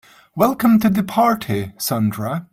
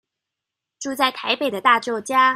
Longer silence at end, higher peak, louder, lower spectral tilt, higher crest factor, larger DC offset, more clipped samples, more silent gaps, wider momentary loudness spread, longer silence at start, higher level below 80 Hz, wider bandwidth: about the same, 0.1 s vs 0 s; about the same, -2 dBFS vs -2 dBFS; about the same, -18 LUFS vs -20 LUFS; first, -6 dB/octave vs -2 dB/octave; about the same, 16 dB vs 20 dB; neither; neither; neither; about the same, 10 LU vs 9 LU; second, 0.35 s vs 0.8 s; first, -52 dBFS vs -72 dBFS; about the same, 16.5 kHz vs 15.5 kHz